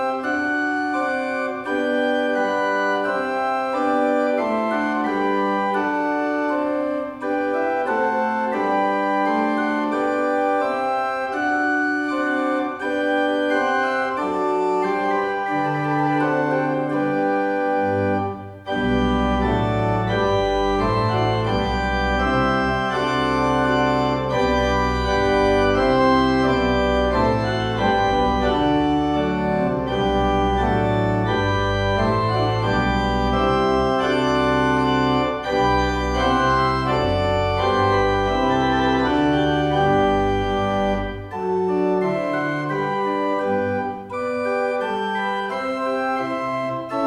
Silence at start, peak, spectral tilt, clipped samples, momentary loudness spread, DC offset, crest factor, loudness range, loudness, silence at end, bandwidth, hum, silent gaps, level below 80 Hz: 0 s; -6 dBFS; -6.5 dB/octave; under 0.1%; 5 LU; under 0.1%; 14 dB; 3 LU; -20 LUFS; 0 s; 11.5 kHz; none; none; -36 dBFS